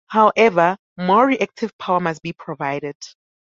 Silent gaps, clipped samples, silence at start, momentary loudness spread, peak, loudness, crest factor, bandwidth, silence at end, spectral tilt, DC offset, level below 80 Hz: 0.79-0.96 s, 1.73-1.79 s, 2.95-3.00 s; under 0.1%; 0.1 s; 16 LU; -2 dBFS; -18 LUFS; 18 dB; 7.6 kHz; 0.45 s; -6 dB/octave; under 0.1%; -64 dBFS